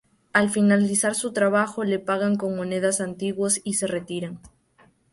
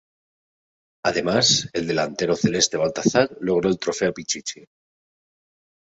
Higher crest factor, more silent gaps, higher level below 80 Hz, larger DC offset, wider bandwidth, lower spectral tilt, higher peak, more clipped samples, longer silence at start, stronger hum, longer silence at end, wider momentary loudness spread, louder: about the same, 20 dB vs 20 dB; neither; second, -64 dBFS vs -56 dBFS; neither; first, 11.5 kHz vs 8.2 kHz; about the same, -4.5 dB/octave vs -3.5 dB/octave; about the same, -4 dBFS vs -4 dBFS; neither; second, 0.35 s vs 1.05 s; neither; second, 0.65 s vs 1.35 s; about the same, 10 LU vs 9 LU; about the same, -23 LUFS vs -21 LUFS